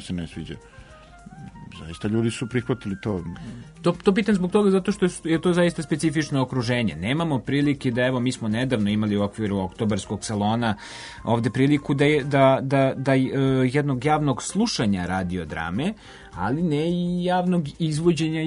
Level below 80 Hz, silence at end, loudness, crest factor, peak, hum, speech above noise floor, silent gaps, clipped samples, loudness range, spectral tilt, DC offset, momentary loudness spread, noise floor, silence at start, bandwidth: -50 dBFS; 0 s; -23 LUFS; 18 dB; -4 dBFS; none; 22 dB; none; under 0.1%; 5 LU; -6 dB/octave; under 0.1%; 12 LU; -45 dBFS; 0 s; 11 kHz